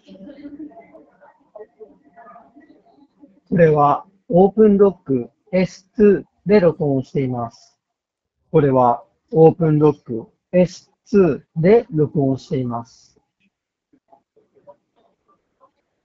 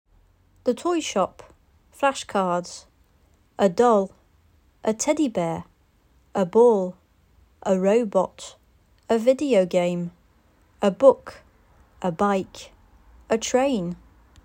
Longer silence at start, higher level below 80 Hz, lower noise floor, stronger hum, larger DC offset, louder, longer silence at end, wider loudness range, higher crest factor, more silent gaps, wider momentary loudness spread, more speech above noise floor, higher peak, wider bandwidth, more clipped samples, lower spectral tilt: second, 0.2 s vs 0.65 s; first, -52 dBFS vs -58 dBFS; first, -81 dBFS vs -60 dBFS; neither; neither; first, -17 LUFS vs -23 LUFS; first, 3.2 s vs 0.5 s; first, 6 LU vs 3 LU; about the same, 20 dB vs 22 dB; neither; about the same, 16 LU vs 16 LU; first, 65 dB vs 39 dB; about the same, 0 dBFS vs -2 dBFS; second, 7.4 kHz vs 16 kHz; neither; first, -8.5 dB/octave vs -5 dB/octave